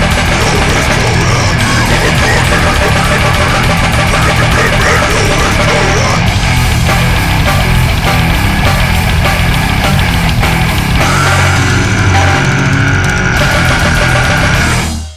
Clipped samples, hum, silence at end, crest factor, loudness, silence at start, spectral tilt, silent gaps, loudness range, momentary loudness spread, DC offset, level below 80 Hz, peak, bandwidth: under 0.1%; none; 0 s; 10 dB; -9 LUFS; 0 s; -4.5 dB/octave; none; 1 LU; 2 LU; 2%; -16 dBFS; 0 dBFS; 16 kHz